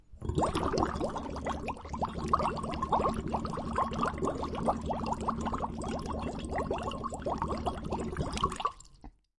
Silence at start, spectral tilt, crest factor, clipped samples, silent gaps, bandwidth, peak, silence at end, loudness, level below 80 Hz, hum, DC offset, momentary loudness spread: 0.1 s; -6 dB/octave; 20 dB; under 0.1%; none; 11.5 kHz; -14 dBFS; 0.3 s; -34 LUFS; -44 dBFS; none; under 0.1%; 6 LU